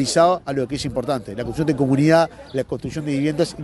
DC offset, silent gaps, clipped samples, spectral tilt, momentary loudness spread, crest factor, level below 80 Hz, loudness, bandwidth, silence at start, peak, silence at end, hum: under 0.1%; none; under 0.1%; -6 dB/octave; 11 LU; 16 dB; -46 dBFS; -21 LUFS; 11.5 kHz; 0 s; -4 dBFS; 0 s; none